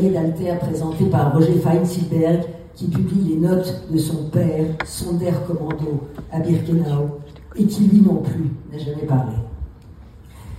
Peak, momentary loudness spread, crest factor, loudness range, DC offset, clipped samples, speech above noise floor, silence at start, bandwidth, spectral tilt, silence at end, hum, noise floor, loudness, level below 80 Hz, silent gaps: -2 dBFS; 12 LU; 16 dB; 3 LU; under 0.1%; under 0.1%; 23 dB; 0 s; 15 kHz; -8 dB/octave; 0 s; none; -41 dBFS; -20 LUFS; -42 dBFS; none